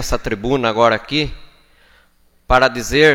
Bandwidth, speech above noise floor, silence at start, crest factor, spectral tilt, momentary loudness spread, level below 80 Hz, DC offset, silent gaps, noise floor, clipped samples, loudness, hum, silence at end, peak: 17 kHz; 39 dB; 0 s; 18 dB; -4.5 dB/octave; 7 LU; -30 dBFS; under 0.1%; none; -55 dBFS; under 0.1%; -16 LUFS; none; 0 s; 0 dBFS